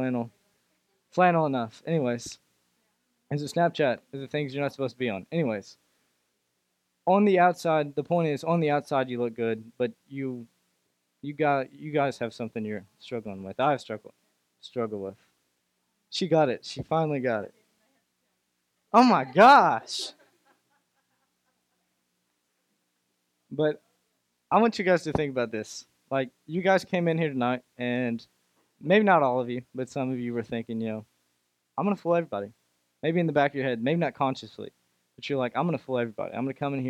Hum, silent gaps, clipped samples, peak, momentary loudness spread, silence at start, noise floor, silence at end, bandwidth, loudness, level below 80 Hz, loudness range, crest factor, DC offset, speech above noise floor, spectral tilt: none; none; under 0.1%; -6 dBFS; 16 LU; 0 s; -77 dBFS; 0 s; 14 kHz; -26 LUFS; -68 dBFS; 9 LU; 22 dB; under 0.1%; 51 dB; -6 dB/octave